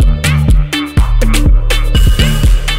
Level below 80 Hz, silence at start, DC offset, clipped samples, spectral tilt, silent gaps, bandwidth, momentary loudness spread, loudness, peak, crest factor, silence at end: -10 dBFS; 0 s; under 0.1%; 0.1%; -5 dB/octave; none; 16.5 kHz; 3 LU; -12 LUFS; 0 dBFS; 8 dB; 0 s